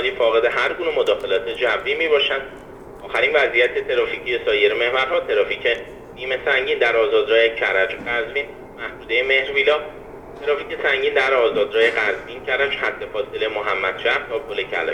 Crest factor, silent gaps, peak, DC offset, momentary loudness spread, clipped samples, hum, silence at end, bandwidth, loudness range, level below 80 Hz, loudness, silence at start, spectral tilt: 18 dB; none; -4 dBFS; under 0.1%; 11 LU; under 0.1%; none; 0 s; 10.5 kHz; 2 LU; -50 dBFS; -19 LUFS; 0 s; -3.5 dB/octave